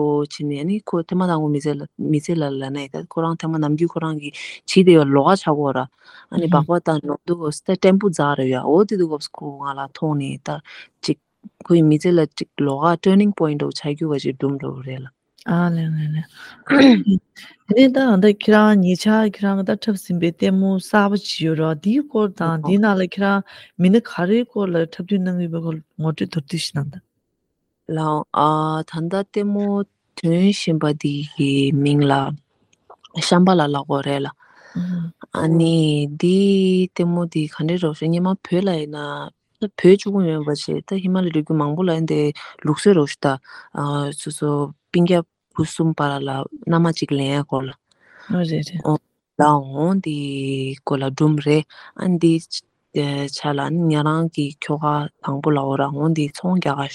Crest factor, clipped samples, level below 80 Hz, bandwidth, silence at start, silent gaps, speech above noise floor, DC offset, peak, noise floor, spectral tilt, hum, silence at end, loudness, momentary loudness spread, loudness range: 18 dB; under 0.1%; -62 dBFS; 12 kHz; 0 s; none; 55 dB; under 0.1%; 0 dBFS; -73 dBFS; -7 dB/octave; none; 0 s; -19 LUFS; 12 LU; 6 LU